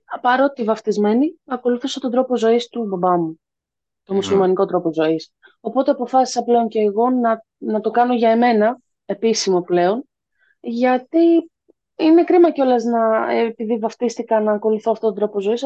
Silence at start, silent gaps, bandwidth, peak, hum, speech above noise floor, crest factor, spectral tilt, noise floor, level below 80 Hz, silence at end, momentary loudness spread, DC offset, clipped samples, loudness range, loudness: 0.1 s; none; 8.4 kHz; -4 dBFS; none; 67 dB; 14 dB; -5.5 dB/octave; -84 dBFS; -68 dBFS; 0 s; 9 LU; under 0.1%; under 0.1%; 3 LU; -18 LUFS